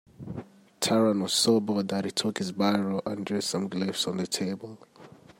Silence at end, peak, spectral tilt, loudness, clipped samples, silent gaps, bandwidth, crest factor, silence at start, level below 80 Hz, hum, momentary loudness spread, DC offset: 0.3 s; -10 dBFS; -4 dB/octave; -27 LUFS; under 0.1%; none; 16 kHz; 18 dB; 0.2 s; -68 dBFS; none; 16 LU; under 0.1%